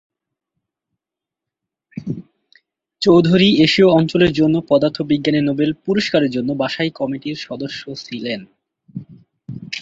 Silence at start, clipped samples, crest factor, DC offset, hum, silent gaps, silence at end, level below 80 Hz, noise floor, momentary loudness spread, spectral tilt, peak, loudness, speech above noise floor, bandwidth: 1.95 s; under 0.1%; 16 dB; under 0.1%; none; none; 0 s; -52 dBFS; -86 dBFS; 20 LU; -6.5 dB/octave; -2 dBFS; -16 LUFS; 70 dB; 7.8 kHz